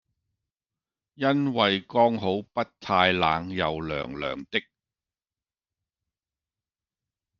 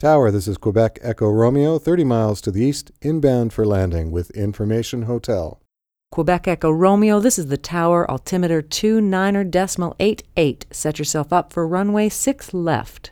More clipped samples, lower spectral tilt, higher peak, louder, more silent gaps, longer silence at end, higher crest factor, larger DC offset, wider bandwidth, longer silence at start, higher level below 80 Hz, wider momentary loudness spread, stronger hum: neither; about the same, -6.5 dB/octave vs -6 dB/octave; about the same, -4 dBFS vs -2 dBFS; second, -25 LUFS vs -19 LUFS; neither; first, 2.8 s vs 0.05 s; first, 24 dB vs 16 dB; neither; second, 7 kHz vs 19 kHz; first, 1.2 s vs 0 s; second, -60 dBFS vs -42 dBFS; about the same, 10 LU vs 8 LU; neither